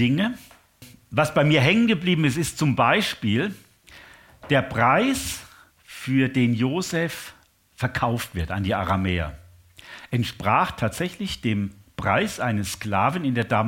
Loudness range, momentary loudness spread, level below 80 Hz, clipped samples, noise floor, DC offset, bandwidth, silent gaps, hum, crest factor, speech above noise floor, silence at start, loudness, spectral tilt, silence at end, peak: 5 LU; 12 LU; -48 dBFS; under 0.1%; -50 dBFS; under 0.1%; 17 kHz; none; none; 20 dB; 28 dB; 0 s; -23 LUFS; -5.5 dB/octave; 0 s; -4 dBFS